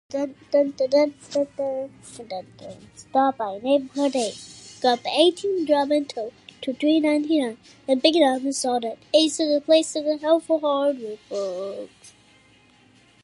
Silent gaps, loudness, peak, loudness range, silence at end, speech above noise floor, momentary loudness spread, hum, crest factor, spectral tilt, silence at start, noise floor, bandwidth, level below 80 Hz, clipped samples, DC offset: none; -23 LUFS; -4 dBFS; 5 LU; 1.15 s; 33 dB; 16 LU; none; 20 dB; -3 dB/octave; 0.1 s; -56 dBFS; 11.5 kHz; -70 dBFS; under 0.1%; under 0.1%